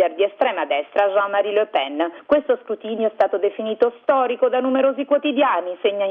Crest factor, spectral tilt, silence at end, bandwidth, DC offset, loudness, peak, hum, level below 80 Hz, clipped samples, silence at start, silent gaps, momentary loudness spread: 14 dB; -6.5 dB/octave; 0 s; 4.7 kHz; under 0.1%; -20 LUFS; -6 dBFS; none; -66 dBFS; under 0.1%; 0 s; none; 5 LU